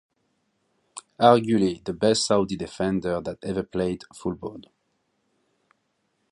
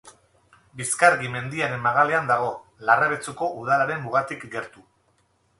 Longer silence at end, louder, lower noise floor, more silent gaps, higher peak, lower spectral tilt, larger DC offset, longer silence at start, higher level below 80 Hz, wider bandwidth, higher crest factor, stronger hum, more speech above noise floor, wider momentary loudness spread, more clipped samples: first, 1.7 s vs 0.9 s; about the same, -24 LUFS vs -23 LUFS; first, -73 dBFS vs -66 dBFS; neither; about the same, -2 dBFS vs -2 dBFS; about the same, -5 dB/octave vs -4 dB/octave; neither; first, 0.95 s vs 0.05 s; first, -54 dBFS vs -64 dBFS; about the same, 11.5 kHz vs 11.5 kHz; about the same, 24 dB vs 22 dB; neither; first, 50 dB vs 43 dB; first, 18 LU vs 13 LU; neither